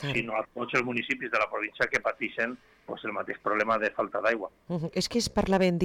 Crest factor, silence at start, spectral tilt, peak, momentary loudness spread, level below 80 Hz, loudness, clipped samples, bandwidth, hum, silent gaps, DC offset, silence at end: 14 dB; 0 s; -5 dB/octave; -14 dBFS; 8 LU; -54 dBFS; -29 LUFS; under 0.1%; 16 kHz; none; none; under 0.1%; 0 s